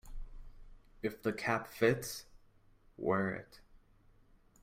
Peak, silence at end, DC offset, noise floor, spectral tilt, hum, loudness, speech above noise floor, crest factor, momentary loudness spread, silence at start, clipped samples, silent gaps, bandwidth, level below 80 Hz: -16 dBFS; 0.85 s; under 0.1%; -65 dBFS; -5.5 dB/octave; none; -36 LUFS; 30 dB; 22 dB; 20 LU; 0.05 s; under 0.1%; none; 16 kHz; -54 dBFS